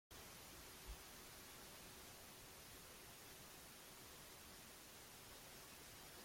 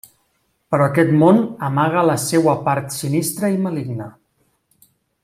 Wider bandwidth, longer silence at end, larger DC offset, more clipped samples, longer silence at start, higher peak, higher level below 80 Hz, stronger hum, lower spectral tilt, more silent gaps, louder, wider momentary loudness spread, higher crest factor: about the same, 16.5 kHz vs 16 kHz; second, 0 s vs 1.15 s; neither; neither; second, 0.1 s vs 0.7 s; second, -44 dBFS vs -2 dBFS; second, -70 dBFS vs -60 dBFS; neither; second, -2 dB/octave vs -6 dB/octave; neither; second, -58 LUFS vs -17 LUFS; second, 2 LU vs 11 LU; about the same, 16 dB vs 16 dB